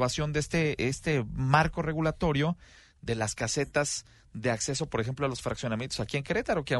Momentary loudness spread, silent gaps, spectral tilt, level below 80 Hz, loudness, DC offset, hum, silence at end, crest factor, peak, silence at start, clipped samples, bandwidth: 7 LU; none; -4.5 dB/octave; -48 dBFS; -30 LUFS; under 0.1%; none; 0 s; 22 dB; -8 dBFS; 0 s; under 0.1%; 11.5 kHz